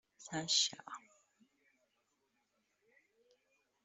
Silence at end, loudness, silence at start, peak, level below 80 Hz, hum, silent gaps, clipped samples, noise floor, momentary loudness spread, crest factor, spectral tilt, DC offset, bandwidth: 2.85 s; -35 LUFS; 0.2 s; -18 dBFS; -86 dBFS; 50 Hz at -100 dBFS; none; under 0.1%; -82 dBFS; 20 LU; 28 dB; -1 dB/octave; under 0.1%; 8.2 kHz